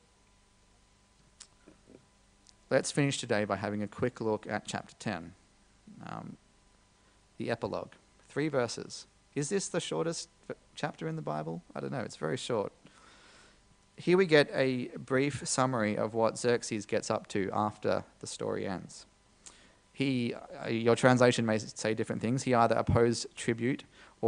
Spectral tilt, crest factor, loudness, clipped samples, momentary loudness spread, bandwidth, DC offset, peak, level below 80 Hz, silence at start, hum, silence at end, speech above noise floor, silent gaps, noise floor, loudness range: -5 dB/octave; 24 dB; -32 LUFS; under 0.1%; 15 LU; 10 kHz; under 0.1%; -8 dBFS; -62 dBFS; 2.7 s; 50 Hz at -65 dBFS; 0 s; 34 dB; none; -65 dBFS; 10 LU